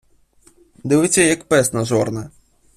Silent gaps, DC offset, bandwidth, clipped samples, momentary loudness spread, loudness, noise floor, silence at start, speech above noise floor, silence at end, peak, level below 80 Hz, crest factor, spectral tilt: none; under 0.1%; 15.5 kHz; under 0.1%; 17 LU; -17 LUFS; -54 dBFS; 0.85 s; 37 dB; 0.5 s; -2 dBFS; -52 dBFS; 18 dB; -4 dB/octave